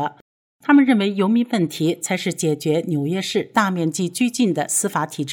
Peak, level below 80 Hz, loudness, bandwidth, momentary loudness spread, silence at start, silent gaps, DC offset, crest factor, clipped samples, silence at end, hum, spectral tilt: -6 dBFS; -74 dBFS; -20 LUFS; 20 kHz; 7 LU; 0 s; 0.21-0.59 s; under 0.1%; 14 dB; under 0.1%; 0 s; none; -4.5 dB/octave